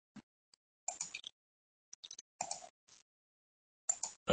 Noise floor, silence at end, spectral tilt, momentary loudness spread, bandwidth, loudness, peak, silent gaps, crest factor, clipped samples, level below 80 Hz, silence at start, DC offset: under -90 dBFS; 0 s; -2 dB/octave; 21 LU; 8.8 kHz; -43 LUFS; -16 dBFS; 0.23-0.87 s, 1.32-2.03 s, 2.21-2.39 s, 2.70-2.87 s, 3.02-3.88 s, 4.16-4.26 s; 30 dB; under 0.1%; -84 dBFS; 0.15 s; under 0.1%